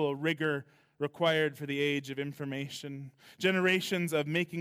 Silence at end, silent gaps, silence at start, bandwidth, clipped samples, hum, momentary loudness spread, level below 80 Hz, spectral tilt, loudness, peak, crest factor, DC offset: 0 s; none; 0 s; 16.5 kHz; under 0.1%; none; 12 LU; -78 dBFS; -5 dB/octave; -31 LUFS; -14 dBFS; 18 dB; under 0.1%